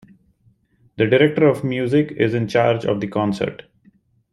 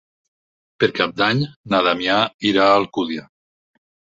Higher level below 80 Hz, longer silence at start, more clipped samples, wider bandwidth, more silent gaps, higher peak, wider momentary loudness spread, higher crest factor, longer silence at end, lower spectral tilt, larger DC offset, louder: about the same, -56 dBFS vs -58 dBFS; first, 1 s vs 0.8 s; neither; first, 12 kHz vs 7.8 kHz; second, none vs 1.56-1.64 s, 2.34-2.39 s; about the same, -2 dBFS vs -2 dBFS; about the same, 7 LU vs 9 LU; about the same, 18 dB vs 20 dB; second, 0.8 s vs 0.95 s; first, -7.5 dB/octave vs -5.5 dB/octave; neither; about the same, -19 LUFS vs -18 LUFS